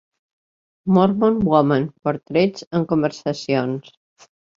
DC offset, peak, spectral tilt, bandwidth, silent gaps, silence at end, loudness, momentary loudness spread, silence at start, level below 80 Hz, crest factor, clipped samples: under 0.1%; -2 dBFS; -7.5 dB/octave; 7.6 kHz; 2.67-2.71 s; 0.8 s; -19 LUFS; 10 LU; 0.85 s; -54 dBFS; 18 dB; under 0.1%